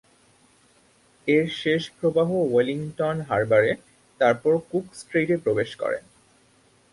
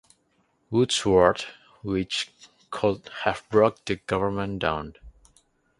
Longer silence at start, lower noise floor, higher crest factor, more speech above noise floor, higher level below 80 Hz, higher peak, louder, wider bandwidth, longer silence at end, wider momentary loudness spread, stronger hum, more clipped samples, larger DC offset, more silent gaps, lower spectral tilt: first, 1.25 s vs 0.7 s; second, -60 dBFS vs -68 dBFS; second, 18 dB vs 24 dB; second, 37 dB vs 44 dB; second, -62 dBFS vs -50 dBFS; second, -6 dBFS vs -2 dBFS; about the same, -24 LUFS vs -25 LUFS; about the same, 11.5 kHz vs 11.5 kHz; first, 0.9 s vs 0.7 s; second, 9 LU vs 15 LU; neither; neither; neither; neither; first, -6.5 dB/octave vs -4.5 dB/octave